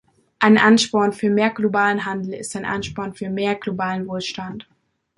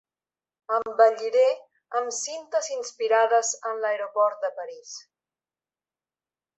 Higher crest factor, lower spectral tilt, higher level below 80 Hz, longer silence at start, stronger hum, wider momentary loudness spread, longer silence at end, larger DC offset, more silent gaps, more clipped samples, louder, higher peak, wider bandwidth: about the same, 18 dB vs 20 dB; first, -4.5 dB/octave vs 1 dB/octave; first, -56 dBFS vs -82 dBFS; second, 0.4 s vs 0.7 s; neither; about the same, 14 LU vs 16 LU; second, 0.55 s vs 1.55 s; neither; neither; neither; first, -20 LUFS vs -25 LUFS; first, -2 dBFS vs -6 dBFS; first, 11.5 kHz vs 8.4 kHz